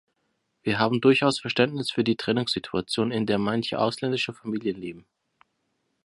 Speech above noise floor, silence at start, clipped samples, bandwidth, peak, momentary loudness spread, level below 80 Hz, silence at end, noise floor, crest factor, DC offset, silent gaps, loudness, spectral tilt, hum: 50 dB; 0.65 s; under 0.1%; 11.5 kHz; -4 dBFS; 10 LU; -62 dBFS; 1.05 s; -75 dBFS; 22 dB; under 0.1%; none; -25 LUFS; -5.5 dB/octave; none